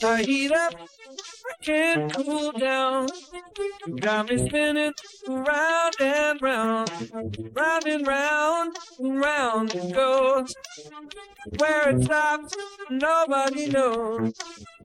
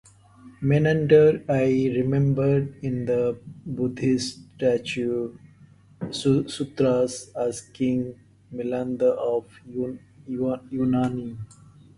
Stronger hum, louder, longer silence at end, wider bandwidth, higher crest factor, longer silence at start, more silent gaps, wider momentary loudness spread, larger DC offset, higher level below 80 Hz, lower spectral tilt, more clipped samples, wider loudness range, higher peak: neither; about the same, -24 LUFS vs -24 LUFS; second, 0.15 s vs 0.5 s; first, 15.5 kHz vs 11.5 kHz; about the same, 16 dB vs 20 dB; second, 0 s vs 0.45 s; neither; first, 17 LU vs 14 LU; neither; about the same, -54 dBFS vs -56 dBFS; second, -4.5 dB/octave vs -7 dB/octave; neither; second, 2 LU vs 6 LU; second, -10 dBFS vs -4 dBFS